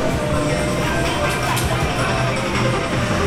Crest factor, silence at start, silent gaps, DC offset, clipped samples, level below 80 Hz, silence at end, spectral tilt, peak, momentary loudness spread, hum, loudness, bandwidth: 12 dB; 0 s; none; under 0.1%; under 0.1%; -32 dBFS; 0 s; -5 dB/octave; -6 dBFS; 1 LU; none; -19 LUFS; 16.5 kHz